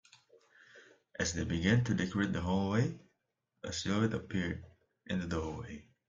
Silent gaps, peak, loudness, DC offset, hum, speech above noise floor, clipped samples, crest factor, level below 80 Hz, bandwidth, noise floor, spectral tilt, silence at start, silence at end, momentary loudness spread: none; -16 dBFS; -34 LUFS; under 0.1%; none; 50 dB; under 0.1%; 20 dB; -58 dBFS; 7.6 kHz; -83 dBFS; -5.5 dB/octave; 0.75 s; 0.25 s; 15 LU